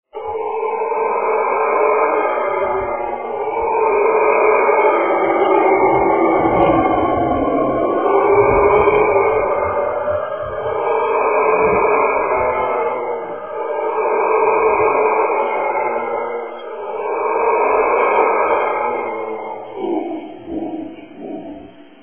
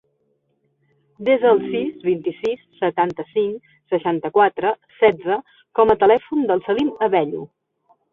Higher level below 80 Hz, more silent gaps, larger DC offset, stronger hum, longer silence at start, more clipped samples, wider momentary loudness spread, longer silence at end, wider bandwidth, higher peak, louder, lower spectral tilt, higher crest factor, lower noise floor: first, -44 dBFS vs -58 dBFS; neither; first, 0.4% vs under 0.1%; neither; second, 0.15 s vs 1.2 s; neither; first, 13 LU vs 10 LU; second, 0.2 s vs 0.65 s; second, 3.4 kHz vs 4.7 kHz; about the same, 0 dBFS vs -2 dBFS; first, -16 LUFS vs -19 LUFS; first, -10 dB/octave vs -7.5 dB/octave; about the same, 16 dB vs 18 dB; second, -38 dBFS vs -67 dBFS